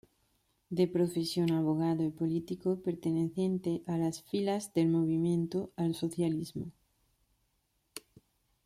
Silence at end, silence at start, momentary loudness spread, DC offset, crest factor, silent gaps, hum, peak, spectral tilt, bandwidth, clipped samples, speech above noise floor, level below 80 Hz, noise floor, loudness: 0.65 s; 0.7 s; 10 LU; under 0.1%; 16 dB; none; none; -18 dBFS; -7 dB/octave; 14.5 kHz; under 0.1%; 46 dB; -70 dBFS; -77 dBFS; -32 LUFS